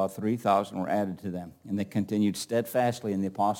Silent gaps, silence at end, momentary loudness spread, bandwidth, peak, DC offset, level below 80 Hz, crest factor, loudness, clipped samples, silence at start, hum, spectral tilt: none; 0 s; 9 LU; 17 kHz; -10 dBFS; under 0.1%; -70 dBFS; 18 dB; -29 LUFS; under 0.1%; 0 s; none; -6 dB/octave